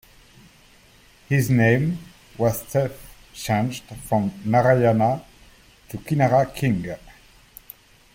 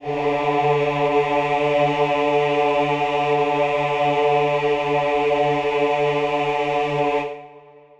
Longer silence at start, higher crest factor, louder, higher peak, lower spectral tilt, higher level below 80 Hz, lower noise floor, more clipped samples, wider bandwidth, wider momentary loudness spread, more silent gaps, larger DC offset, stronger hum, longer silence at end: first, 1.3 s vs 0 s; about the same, 18 dB vs 14 dB; about the same, -21 LUFS vs -20 LUFS; about the same, -6 dBFS vs -6 dBFS; about the same, -7 dB/octave vs -6 dB/octave; about the same, -50 dBFS vs -52 dBFS; first, -53 dBFS vs -46 dBFS; neither; first, 17 kHz vs 8.6 kHz; first, 20 LU vs 3 LU; neither; neither; neither; first, 1.2 s vs 0.4 s